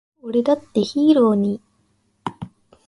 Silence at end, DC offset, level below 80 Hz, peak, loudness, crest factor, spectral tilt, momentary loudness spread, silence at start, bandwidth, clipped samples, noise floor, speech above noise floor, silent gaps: 0.4 s; under 0.1%; -60 dBFS; -4 dBFS; -18 LUFS; 16 dB; -7.5 dB/octave; 18 LU; 0.25 s; 11 kHz; under 0.1%; -64 dBFS; 47 dB; none